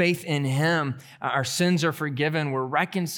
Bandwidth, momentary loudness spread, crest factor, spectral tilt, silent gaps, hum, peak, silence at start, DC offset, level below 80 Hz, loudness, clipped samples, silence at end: 18.5 kHz; 4 LU; 18 dB; -5 dB/octave; none; none; -8 dBFS; 0 s; under 0.1%; -74 dBFS; -25 LUFS; under 0.1%; 0 s